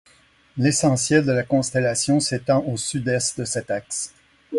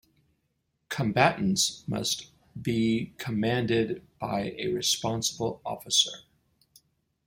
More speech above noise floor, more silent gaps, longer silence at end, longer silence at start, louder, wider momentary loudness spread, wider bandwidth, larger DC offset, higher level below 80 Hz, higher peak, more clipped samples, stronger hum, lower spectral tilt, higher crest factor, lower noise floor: second, 35 dB vs 49 dB; neither; second, 0 s vs 1.05 s; second, 0.55 s vs 0.9 s; first, -21 LUFS vs -28 LUFS; about the same, 9 LU vs 11 LU; second, 11.5 kHz vs 16.5 kHz; neither; about the same, -56 dBFS vs -60 dBFS; about the same, -4 dBFS vs -6 dBFS; neither; neither; about the same, -4.5 dB/octave vs -3.5 dB/octave; second, 18 dB vs 24 dB; second, -56 dBFS vs -77 dBFS